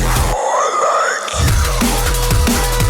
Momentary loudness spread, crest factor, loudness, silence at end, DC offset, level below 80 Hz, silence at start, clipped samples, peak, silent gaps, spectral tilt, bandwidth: 2 LU; 10 dB; -15 LUFS; 0 s; under 0.1%; -20 dBFS; 0 s; under 0.1%; -4 dBFS; none; -4 dB/octave; 19.5 kHz